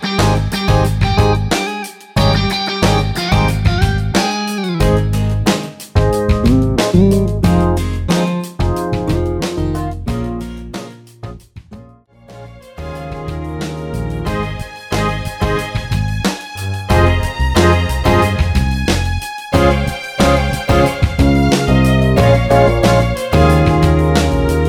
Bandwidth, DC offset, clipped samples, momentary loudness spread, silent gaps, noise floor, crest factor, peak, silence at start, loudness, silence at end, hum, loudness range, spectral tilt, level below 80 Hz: 16.5 kHz; under 0.1%; under 0.1%; 12 LU; none; -42 dBFS; 14 dB; 0 dBFS; 0 s; -15 LUFS; 0 s; none; 12 LU; -6 dB/octave; -22 dBFS